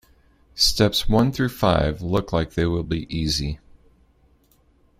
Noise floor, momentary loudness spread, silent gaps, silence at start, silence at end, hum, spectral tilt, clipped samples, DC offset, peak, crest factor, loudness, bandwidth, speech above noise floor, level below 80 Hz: -59 dBFS; 8 LU; none; 0.55 s; 1.4 s; none; -5 dB/octave; under 0.1%; under 0.1%; -4 dBFS; 20 dB; -22 LUFS; 16 kHz; 38 dB; -36 dBFS